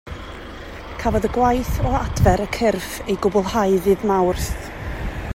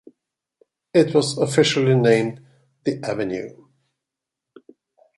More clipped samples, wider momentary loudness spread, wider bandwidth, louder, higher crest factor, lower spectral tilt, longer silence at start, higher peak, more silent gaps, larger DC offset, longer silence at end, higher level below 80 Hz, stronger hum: neither; first, 16 LU vs 12 LU; first, 16 kHz vs 11.5 kHz; about the same, -20 LUFS vs -20 LUFS; about the same, 18 dB vs 20 dB; about the same, -6 dB/octave vs -5.5 dB/octave; second, 0.05 s vs 0.95 s; about the same, -2 dBFS vs -2 dBFS; neither; neither; second, 0 s vs 1.7 s; first, -30 dBFS vs -64 dBFS; neither